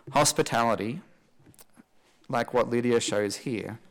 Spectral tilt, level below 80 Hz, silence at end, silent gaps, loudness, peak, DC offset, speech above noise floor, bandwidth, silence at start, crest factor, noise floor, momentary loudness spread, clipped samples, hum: -4 dB/octave; -60 dBFS; 0.15 s; none; -27 LUFS; -14 dBFS; under 0.1%; 33 dB; 18 kHz; 0.05 s; 14 dB; -59 dBFS; 11 LU; under 0.1%; none